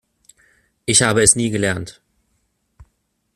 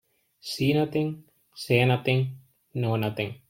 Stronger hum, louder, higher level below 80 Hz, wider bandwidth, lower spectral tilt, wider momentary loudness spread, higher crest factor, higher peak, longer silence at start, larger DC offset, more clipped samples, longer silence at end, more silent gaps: neither; first, -15 LUFS vs -26 LUFS; first, -48 dBFS vs -62 dBFS; about the same, 15.5 kHz vs 16.5 kHz; second, -3 dB/octave vs -6.5 dB/octave; about the same, 17 LU vs 16 LU; about the same, 22 dB vs 20 dB; first, 0 dBFS vs -6 dBFS; first, 0.9 s vs 0.45 s; neither; neither; first, 0.5 s vs 0.15 s; neither